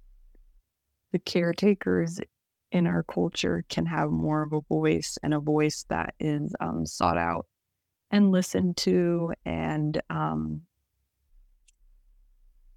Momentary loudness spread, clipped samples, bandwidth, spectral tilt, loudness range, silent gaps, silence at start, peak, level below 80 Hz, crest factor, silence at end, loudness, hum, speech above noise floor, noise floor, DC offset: 8 LU; under 0.1%; 14.5 kHz; -6 dB/octave; 3 LU; none; 1.15 s; -10 dBFS; -54 dBFS; 18 dB; 2.15 s; -27 LUFS; none; 56 dB; -82 dBFS; under 0.1%